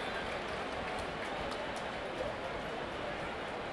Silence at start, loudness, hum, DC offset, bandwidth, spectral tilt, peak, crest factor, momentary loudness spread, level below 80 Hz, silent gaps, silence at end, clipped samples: 0 s; -39 LUFS; none; under 0.1%; 12 kHz; -4.5 dB/octave; -26 dBFS; 14 dB; 1 LU; -56 dBFS; none; 0 s; under 0.1%